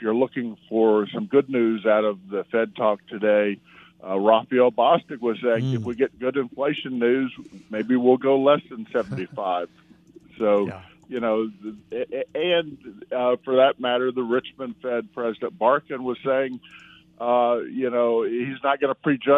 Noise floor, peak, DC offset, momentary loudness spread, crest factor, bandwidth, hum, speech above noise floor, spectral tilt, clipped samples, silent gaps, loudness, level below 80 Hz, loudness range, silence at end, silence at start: -51 dBFS; -4 dBFS; under 0.1%; 12 LU; 20 dB; 6.8 kHz; none; 28 dB; -8 dB/octave; under 0.1%; none; -23 LUFS; -68 dBFS; 4 LU; 0 s; 0 s